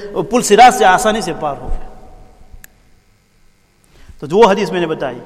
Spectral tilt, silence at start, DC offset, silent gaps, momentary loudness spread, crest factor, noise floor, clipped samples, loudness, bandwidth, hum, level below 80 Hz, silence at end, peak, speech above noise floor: -4 dB/octave; 0 s; under 0.1%; none; 21 LU; 14 dB; -51 dBFS; 0.2%; -12 LUFS; 15 kHz; none; -32 dBFS; 0 s; 0 dBFS; 39 dB